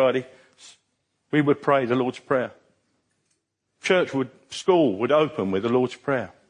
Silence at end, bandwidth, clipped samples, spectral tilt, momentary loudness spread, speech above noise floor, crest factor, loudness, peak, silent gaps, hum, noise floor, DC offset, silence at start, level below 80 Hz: 0.2 s; 10.5 kHz; under 0.1%; -6 dB/octave; 9 LU; 51 dB; 18 dB; -23 LUFS; -6 dBFS; none; none; -74 dBFS; under 0.1%; 0 s; -72 dBFS